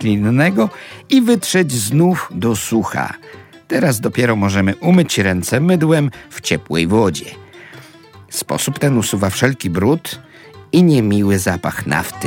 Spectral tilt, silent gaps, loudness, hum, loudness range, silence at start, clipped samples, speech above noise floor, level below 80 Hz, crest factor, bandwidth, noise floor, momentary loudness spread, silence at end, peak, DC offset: -5.5 dB/octave; none; -16 LUFS; none; 4 LU; 0 s; under 0.1%; 26 dB; -48 dBFS; 14 dB; 17.5 kHz; -41 dBFS; 9 LU; 0 s; 0 dBFS; under 0.1%